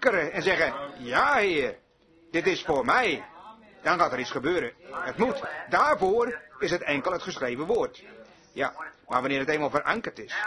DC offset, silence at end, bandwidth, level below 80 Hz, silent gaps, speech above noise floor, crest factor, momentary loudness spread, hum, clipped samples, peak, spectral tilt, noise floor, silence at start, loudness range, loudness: under 0.1%; 0 s; 11 kHz; -58 dBFS; none; 32 dB; 20 dB; 11 LU; none; under 0.1%; -6 dBFS; -4.5 dB/octave; -59 dBFS; 0 s; 3 LU; -27 LUFS